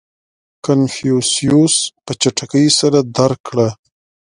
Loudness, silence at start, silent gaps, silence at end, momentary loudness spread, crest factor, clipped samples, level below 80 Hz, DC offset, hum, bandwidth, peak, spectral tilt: -14 LUFS; 0.65 s; 3.40-3.44 s; 0.5 s; 6 LU; 16 dB; under 0.1%; -52 dBFS; under 0.1%; none; 11.5 kHz; 0 dBFS; -4.5 dB/octave